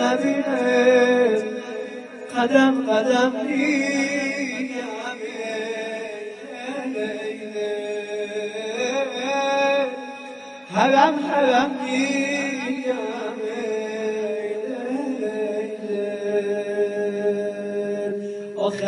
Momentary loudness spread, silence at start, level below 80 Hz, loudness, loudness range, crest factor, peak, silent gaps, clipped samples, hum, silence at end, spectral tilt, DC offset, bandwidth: 12 LU; 0 s; -74 dBFS; -23 LUFS; 8 LU; 20 dB; -2 dBFS; none; under 0.1%; none; 0 s; -4 dB/octave; under 0.1%; 11 kHz